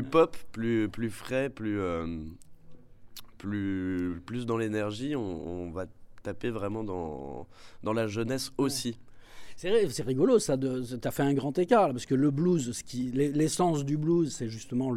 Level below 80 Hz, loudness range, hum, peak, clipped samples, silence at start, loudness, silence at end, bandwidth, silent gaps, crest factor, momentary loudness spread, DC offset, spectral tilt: -54 dBFS; 8 LU; none; -10 dBFS; under 0.1%; 0 s; -30 LUFS; 0 s; 16 kHz; none; 20 dB; 14 LU; under 0.1%; -6 dB/octave